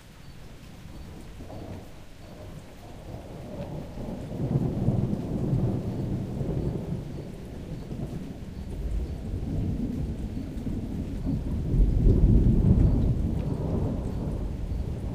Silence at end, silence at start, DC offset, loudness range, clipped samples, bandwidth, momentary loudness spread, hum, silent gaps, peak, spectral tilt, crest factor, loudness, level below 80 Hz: 0 s; 0 s; under 0.1%; 15 LU; under 0.1%; 10.5 kHz; 21 LU; none; none; -8 dBFS; -9 dB/octave; 20 dB; -29 LUFS; -32 dBFS